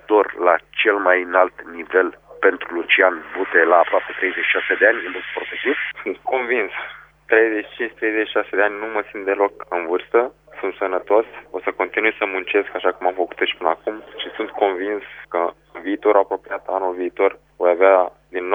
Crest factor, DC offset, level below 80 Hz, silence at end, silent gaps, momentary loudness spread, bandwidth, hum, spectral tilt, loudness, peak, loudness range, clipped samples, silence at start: 20 dB; under 0.1%; -60 dBFS; 0 s; none; 12 LU; 3.8 kHz; 50 Hz at -60 dBFS; -5.5 dB/octave; -19 LUFS; 0 dBFS; 5 LU; under 0.1%; 0.1 s